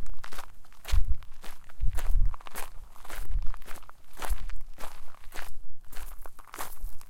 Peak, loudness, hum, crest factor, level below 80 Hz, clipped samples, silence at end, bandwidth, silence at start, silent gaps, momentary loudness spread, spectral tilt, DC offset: -10 dBFS; -39 LUFS; none; 14 dB; -32 dBFS; under 0.1%; 0 s; 16 kHz; 0 s; none; 16 LU; -4 dB/octave; under 0.1%